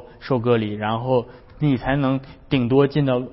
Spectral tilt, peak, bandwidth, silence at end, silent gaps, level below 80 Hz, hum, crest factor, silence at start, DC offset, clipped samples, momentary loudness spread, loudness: -12 dB/octave; -4 dBFS; 5.8 kHz; 0 s; none; -44 dBFS; none; 16 dB; 0 s; under 0.1%; under 0.1%; 7 LU; -21 LUFS